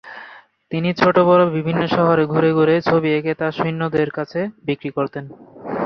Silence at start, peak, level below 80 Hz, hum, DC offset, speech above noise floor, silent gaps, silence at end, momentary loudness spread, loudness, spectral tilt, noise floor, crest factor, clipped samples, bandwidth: 0.05 s; -2 dBFS; -56 dBFS; none; under 0.1%; 25 dB; none; 0 s; 14 LU; -18 LUFS; -8.5 dB/octave; -42 dBFS; 18 dB; under 0.1%; 6.4 kHz